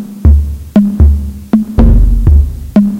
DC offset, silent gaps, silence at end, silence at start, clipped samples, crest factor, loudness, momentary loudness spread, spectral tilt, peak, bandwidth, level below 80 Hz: under 0.1%; none; 0 s; 0 s; 3%; 8 dB; -10 LUFS; 4 LU; -10 dB/octave; 0 dBFS; 3.7 kHz; -10 dBFS